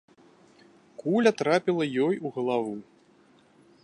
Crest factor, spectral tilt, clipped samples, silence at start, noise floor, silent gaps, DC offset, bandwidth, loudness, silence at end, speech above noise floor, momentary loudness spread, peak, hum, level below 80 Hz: 20 dB; -6 dB/octave; under 0.1%; 1 s; -60 dBFS; none; under 0.1%; 11 kHz; -26 LUFS; 1 s; 34 dB; 13 LU; -8 dBFS; none; -78 dBFS